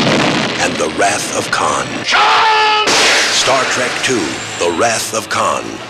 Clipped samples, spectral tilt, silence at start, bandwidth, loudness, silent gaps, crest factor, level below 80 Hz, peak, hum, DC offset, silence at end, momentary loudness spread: under 0.1%; -2 dB/octave; 0 s; 16 kHz; -12 LUFS; none; 12 dB; -48 dBFS; -2 dBFS; none; under 0.1%; 0 s; 8 LU